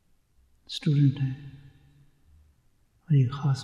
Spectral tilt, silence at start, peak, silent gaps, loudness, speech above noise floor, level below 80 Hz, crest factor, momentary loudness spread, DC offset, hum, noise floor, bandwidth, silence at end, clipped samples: -7.5 dB/octave; 0.7 s; -12 dBFS; none; -26 LUFS; 40 dB; -62 dBFS; 16 dB; 16 LU; under 0.1%; none; -65 dBFS; 9.2 kHz; 0 s; under 0.1%